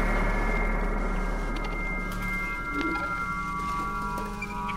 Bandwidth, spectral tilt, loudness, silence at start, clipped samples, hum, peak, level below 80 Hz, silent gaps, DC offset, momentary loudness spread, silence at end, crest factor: 15.5 kHz; -6 dB/octave; -30 LUFS; 0 s; under 0.1%; none; -12 dBFS; -32 dBFS; none; under 0.1%; 4 LU; 0 s; 16 dB